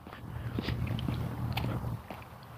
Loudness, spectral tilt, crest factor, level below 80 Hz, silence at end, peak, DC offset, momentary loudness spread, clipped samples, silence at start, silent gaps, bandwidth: -36 LUFS; -7 dB/octave; 16 dB; -46 dBFS; 0 s; -20 dBFS; under 0.1%; 9 LU; under 0.1%; 0 s; none; 15.5 kHz